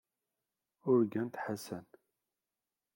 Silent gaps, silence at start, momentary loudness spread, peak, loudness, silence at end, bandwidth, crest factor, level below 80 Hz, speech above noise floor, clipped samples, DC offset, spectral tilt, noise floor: none; 0.85 s; 15 LU; -18 dBFS; -34 LUFS; 1.15 s; 17 kHz; 20 dB; -84 dBFS; over 57 dB; under 0.1%; under 0.1%; -7 dB/octave; under -90 dBFS